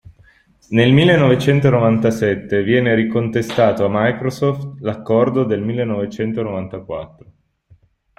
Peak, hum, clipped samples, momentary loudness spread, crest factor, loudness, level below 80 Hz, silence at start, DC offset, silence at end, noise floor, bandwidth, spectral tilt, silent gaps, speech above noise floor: -2 dBFS; none; under 0.1%; 12 LU; 16 dB; -16 LUFS; -50 dBFS; 0.7 s; under 0.1%; 1.15 s; -53 dBFS; 13.5 kHz; -7.5 dB/octave; none; 37 dB